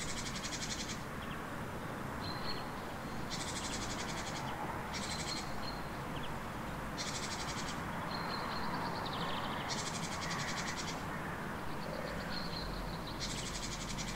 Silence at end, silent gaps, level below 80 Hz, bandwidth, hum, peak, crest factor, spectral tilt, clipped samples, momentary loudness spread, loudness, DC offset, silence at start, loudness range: 0 s; none; -52 dBFS; 16 kHz; none; -24 dBFS; 16 dB; -3.5 dB/octave; under 0.1%; 4 LU; -40 LUFS; under 0.1%; 0 s; 2 LU